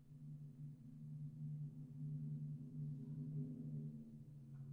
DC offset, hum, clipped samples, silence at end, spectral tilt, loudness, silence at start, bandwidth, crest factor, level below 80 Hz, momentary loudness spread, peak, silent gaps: under 0.1%; none; under 0.1%; 0 s; -11 dB/octave; -51 LUFS; 0 s; 1.5 kHz; 12 dB; -78 dBFS; 9 LU; -38 dBFS; none